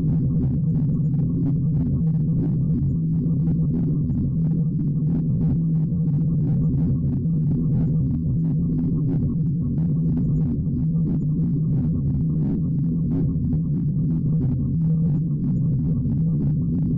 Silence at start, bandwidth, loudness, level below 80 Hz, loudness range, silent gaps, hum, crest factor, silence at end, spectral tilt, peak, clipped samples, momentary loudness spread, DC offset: 0 s; 1.5 kHz; -22 LUFS; -36 dBFS; 1 LU; none; none; 6 dB; 0 s; -14.5 dB/octave; -16 dBFS; under 0.1%; 2 LU; under 0.1%